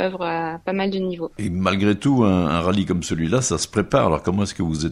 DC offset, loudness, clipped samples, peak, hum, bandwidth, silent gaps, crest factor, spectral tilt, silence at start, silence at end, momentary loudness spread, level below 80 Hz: under 0.1%; -21 LUFS; under 0.1%; -2 dBFS; none; 12 kHz; none; 18 dB; -5.5 dB/octave; 0 s; 0 s; 7 LU; -42 dBFS